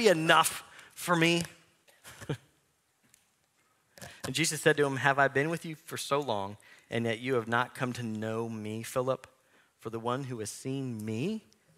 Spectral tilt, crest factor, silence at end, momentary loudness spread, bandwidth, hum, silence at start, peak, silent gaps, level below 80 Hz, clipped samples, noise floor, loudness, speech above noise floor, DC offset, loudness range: -4 dB/octave; 26 dB; 0.4 s; 16 LU; 16 kHz; none; 0 s; -6 dBFS; none; -72 dBFS; under 0.1%; -72 dBFS; -31 LUFS; 42 dB; under 0.1%; 6 LU